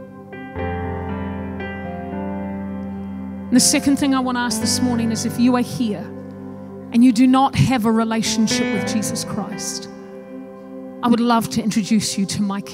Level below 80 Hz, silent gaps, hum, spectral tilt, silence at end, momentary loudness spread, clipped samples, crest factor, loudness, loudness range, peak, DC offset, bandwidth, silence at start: -48 dBFS; none; none; -4.5 dB/octave; 0 s; 19 LU; under 0.1%; 16 dB; -19 LUFS; 5 LU; -4 dBFS; under 0.1%; 16 kHz; 0 s